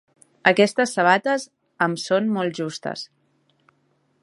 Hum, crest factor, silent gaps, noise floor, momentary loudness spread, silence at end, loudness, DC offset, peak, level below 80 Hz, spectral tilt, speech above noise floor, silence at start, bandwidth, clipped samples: none; 22 dB; none; -66 dBFS; 14 LU; 1.2 s; -21 LUFS; under 0.1%; 0 dBFS; -74 dBFS; -4.5 dB/octave; 45 dB; 0.45 s; 11.5 kHz; under 0.1%